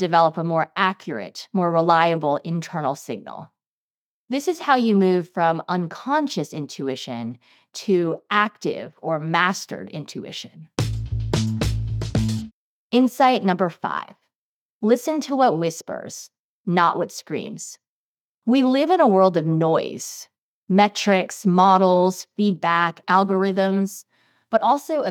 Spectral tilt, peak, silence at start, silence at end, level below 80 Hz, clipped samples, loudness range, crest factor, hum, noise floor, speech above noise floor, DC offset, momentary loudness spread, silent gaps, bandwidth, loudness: -5.5 dB/octave; -2 dBFS; 0 s; 0 s; -44 dBFS; under 0.1%; 6 LU; 20 dB; none; under -90 dBFS; over 69 dB; under 0.1%; 15 LU; 3.67-4.25 s, 12.53-12.90 s, 14.35-14.81 s, 16.39-16.64 s, 17.87-18.42 s, 20.38-20.63 s; 17.5 kHz; -21 LUFS